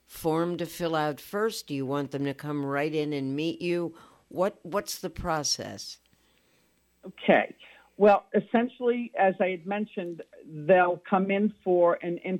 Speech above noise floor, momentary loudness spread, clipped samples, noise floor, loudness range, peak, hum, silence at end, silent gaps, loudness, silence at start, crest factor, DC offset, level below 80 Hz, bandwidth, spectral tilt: 40 dB; 13 LU; under 0.1%; -67 dBFS; 6 LU; -8 dBFS; none; 0 s; none; -27 LUFS; 0.1 s; 20 dB; under 0.1%; -58 dBFS; 16.5 kHz; -5 dB/octave